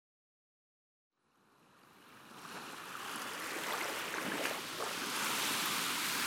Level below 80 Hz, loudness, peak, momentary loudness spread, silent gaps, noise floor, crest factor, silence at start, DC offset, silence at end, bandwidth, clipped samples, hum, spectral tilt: -82 dBFS; -37 LUFS; -20 dBFS; 14 LU; none; -71 dBFS; 22 dB; 1.85 s; under 0.1%; 0 s; 17 kHz; under 0.1%; none; -1 dB/octave